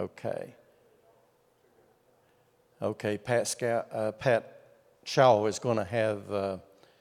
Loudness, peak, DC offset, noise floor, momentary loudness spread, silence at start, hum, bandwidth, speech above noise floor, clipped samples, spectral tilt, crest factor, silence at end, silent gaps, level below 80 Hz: -29 LUFS; -8 dBFS; under 0.1%; -67 dBFS; 14 LU; 0 s; none; 16 kHz; 38 dB; under 0.1%; -5 dB/octave; 24 dB; 0.4 s; none; -74 dBFS